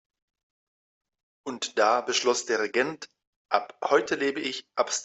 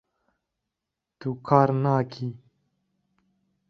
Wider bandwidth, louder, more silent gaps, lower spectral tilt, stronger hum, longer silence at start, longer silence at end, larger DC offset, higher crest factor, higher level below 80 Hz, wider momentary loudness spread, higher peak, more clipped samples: first, 8.4 kHz vs 6.4 kHz; about the same, -26 LUFS vs -24 LUFS; first, 3.27-3.45 s vs none; second, -1.5 dB/octave vs -9.5 dB/octave; neither; first, 1.45 s vs 1.2 s; second, 0 s vs 1.35 s; neither; about the same, 22 dB vs 26 dB; second, -76 dBFS vs -66 dBFS; about the same, 13 LU vs 15 LU; second, -8 dBFS vs -2 dBFS; neither